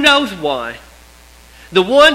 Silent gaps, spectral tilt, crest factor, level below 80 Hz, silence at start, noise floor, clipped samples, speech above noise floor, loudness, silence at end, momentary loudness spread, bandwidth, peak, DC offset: none; -3 dB/octave; 14 dB; -44 dBFS; 0 s; -43 dBFS; 0.2%; 30 dB; -14 LUFS; 0 s; 17 LU; 16 kHz; 0 dBFS; under 0.1%